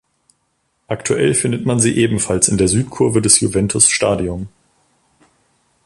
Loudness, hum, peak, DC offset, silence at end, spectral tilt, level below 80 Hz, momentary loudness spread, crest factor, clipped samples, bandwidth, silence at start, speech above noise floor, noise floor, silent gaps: -14 LUFS; none; 0 dBFS; under 0.1%; 1.35 s; -4 dB/octave; -40 dBFS; 12 LU; 18 dB; under 0.1%; 14 kHz; 0.9 s; 51 dB; -66 dBFS; none